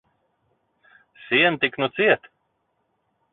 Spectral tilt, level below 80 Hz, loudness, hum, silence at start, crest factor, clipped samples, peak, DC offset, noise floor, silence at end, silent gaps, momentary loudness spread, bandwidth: -9 dB/octave; -68 dBFS; -20 LUFS; none; 1.3 s; 22 dB; under 0.1%; -4 dBFS; under 0.1%; -72 dBFS; 1.15 s; none; 5 LU; 4.2 kHz